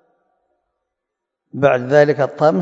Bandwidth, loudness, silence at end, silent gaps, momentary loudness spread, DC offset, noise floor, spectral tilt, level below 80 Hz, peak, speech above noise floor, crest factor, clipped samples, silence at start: 7.8 kHz; -15 LUFS; 0 s; none; 5 LU; under 0.1%; -80 dBFS; -7.5 dB/octave; -60 dBFS; 0 dBFS; 66 dB; 18 dB; under 0.1%; 1.55 s